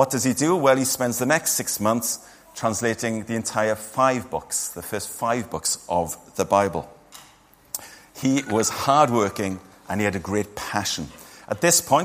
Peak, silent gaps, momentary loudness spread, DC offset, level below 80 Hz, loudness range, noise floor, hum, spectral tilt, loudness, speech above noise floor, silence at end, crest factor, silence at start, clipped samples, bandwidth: -2 dBFS; none; 14 LU; under 0.1%; -56 dBFS; 3 LU; -53 dBFS; none; -3.5 dB/octave; -23 LUFS; 31 dB; 0 s; 20 dB; 0 s; under 0.1%; 15.5 kHz